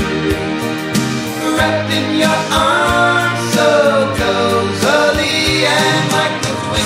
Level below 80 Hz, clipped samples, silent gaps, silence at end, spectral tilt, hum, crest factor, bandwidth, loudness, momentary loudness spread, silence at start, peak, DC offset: -36 dBFS; under 0.1%; none; 0 s; -4 dB/octave; none; 14 dB; 16 kHz; -14 LUFS; 6 LU; 0 s; 0 dBFS; under 0.1%